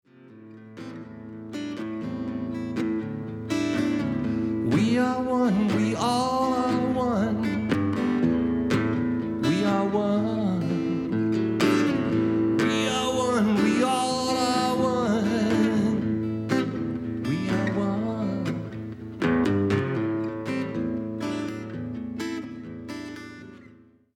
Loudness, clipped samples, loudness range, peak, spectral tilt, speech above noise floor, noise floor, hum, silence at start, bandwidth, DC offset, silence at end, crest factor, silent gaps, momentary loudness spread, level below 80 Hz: -25 LUFS; under 0.1%; 7 LU; -10 dBFS; -6 dB/octave; 30 dB; -53 dBFS; none; 0.2 s; 13.5 kHz; under 0.1%; 0.5 s; 14 dB; none; 12 LU; -58 dBFS